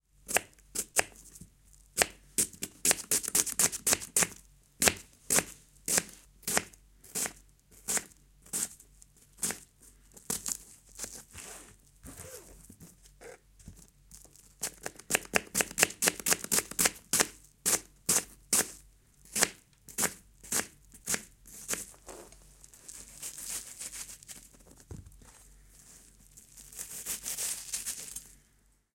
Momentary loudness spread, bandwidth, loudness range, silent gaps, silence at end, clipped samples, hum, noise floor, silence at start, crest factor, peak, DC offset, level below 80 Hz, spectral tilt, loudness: 22 LU; 17 kHz; 16 LU; none; 0.65 s; under 0.1%; none; -68 dBFS; 0.25 s; 34 dB; -2 dBFS; under 0.1%; -60 dBFS; -0.5 dB/octave; -31 LUFS